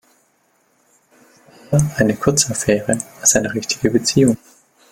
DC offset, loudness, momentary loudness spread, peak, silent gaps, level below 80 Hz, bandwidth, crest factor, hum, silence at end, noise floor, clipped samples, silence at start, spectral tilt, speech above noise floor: under 0.1%; -17 LUFS; 6 LU; 0 dBFS; none; -46 dBFS; 17 kHz; 18 dB; none; 0.55 s; -61 dBFS; under 0.1%; 1.7 s; -4 dB/octave; 44 dB